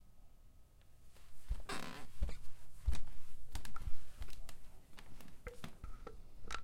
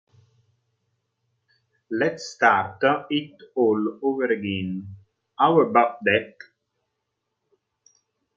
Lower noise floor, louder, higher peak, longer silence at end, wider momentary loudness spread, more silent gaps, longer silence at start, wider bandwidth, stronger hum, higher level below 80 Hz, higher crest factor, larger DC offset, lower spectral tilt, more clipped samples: second, -60 dBFS vs -79 dBFS; second, -50 LUFS vs -22 LUFS; second, -20 dBFS vs -4 dBFS; second, 0 s vs 2.05 s; first, 23 LU vs 13 LU; neither; second, 0.05 s vs 1.9 s; first, 14.5 kHz vs 7.6 kHz; neither; first, -48 dBFS vs -72 dBFS; second, 14 dB vs 22 dB; neither; about the same, -4.5 dB/octave vs -5.5 dB/octave; neither